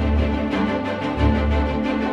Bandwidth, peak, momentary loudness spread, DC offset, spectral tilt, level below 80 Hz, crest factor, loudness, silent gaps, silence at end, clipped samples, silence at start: 7.2 kHz; -6 dBFS; 3 LU; under 0.1%; -8 dB/octave; -24 dBFS; 14 dB; -21 LUFS; none; 0 s; under 0.1%; 0 s